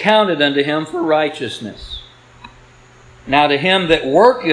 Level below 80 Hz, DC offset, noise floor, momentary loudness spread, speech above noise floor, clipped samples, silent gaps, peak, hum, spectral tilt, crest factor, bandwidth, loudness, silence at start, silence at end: -44 dBFS; under 0.1%; -45 dBFS; 17 LU; 30 dB; under 0.1%; none; 0 dBFS; none; -5 dB/octave; 16 dB; 10.5 kHz; -15 LUFS; 0 s; 0 s